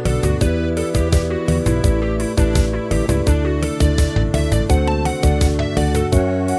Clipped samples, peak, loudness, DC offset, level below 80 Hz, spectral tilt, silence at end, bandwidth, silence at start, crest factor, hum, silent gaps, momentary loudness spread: under 0.1%; -2 dBFS; -18 LUFS; 0.1%; -20 dBFS; -6.5 dB/octave; 0 s; 11 kHz; 0 s; 14 dB; none; none; 3 LU